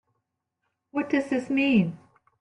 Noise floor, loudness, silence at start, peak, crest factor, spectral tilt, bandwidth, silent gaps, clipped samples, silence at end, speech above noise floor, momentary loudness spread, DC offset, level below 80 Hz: -80 dBFS; -25 LUFS; 0.95 s; -12 dBFS; 16 dB; -7 dB/octave; 10.5 kHz; none; under 0.1%; 0.45 s; 56 dB; 10 LU; under 0.1%; -68 dBFS